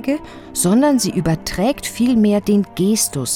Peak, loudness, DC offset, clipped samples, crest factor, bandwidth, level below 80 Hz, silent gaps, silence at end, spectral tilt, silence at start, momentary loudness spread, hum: -4 dBFS; -17 LUFS; under 0.1%; under 0.1%; 14 dB; 17.5 kHz; -42 dBFS; none; 0 s; -5 dB/octave; 0 s; 6 LU; none